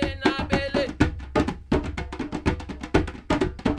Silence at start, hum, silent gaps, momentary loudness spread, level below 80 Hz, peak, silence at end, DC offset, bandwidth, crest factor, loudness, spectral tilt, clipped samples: 0 s; none; none; 7 LU; -34 dBFS; -4 dBFS; 0 s; under 0.1%; 11.5 kHz; 20 dB; -26 LUFS; -6.5 dB/octave; under 0.1%